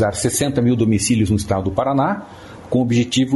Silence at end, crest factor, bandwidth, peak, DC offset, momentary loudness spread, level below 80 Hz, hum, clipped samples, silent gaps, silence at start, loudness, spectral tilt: 0 s; 14 dB; 12 kHz; -4 dBFS; under 0.1%; 7 LU; -42 dBFS; none; under 0.1%; none; 0 s; -18 LUFS; -5.5 dB/octave